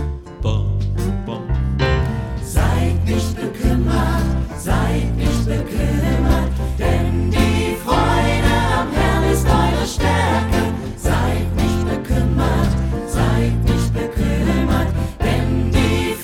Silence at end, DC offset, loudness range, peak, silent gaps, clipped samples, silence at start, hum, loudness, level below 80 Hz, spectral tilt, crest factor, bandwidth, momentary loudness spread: 0 s; under 0.1%; 2 LU; -2 dBFS; none; under 0.1%; 0 s; none; -18 LUFS; -22 dBFS; -6 dB/octave; 16 dB; 16.5 kHz; 5 LU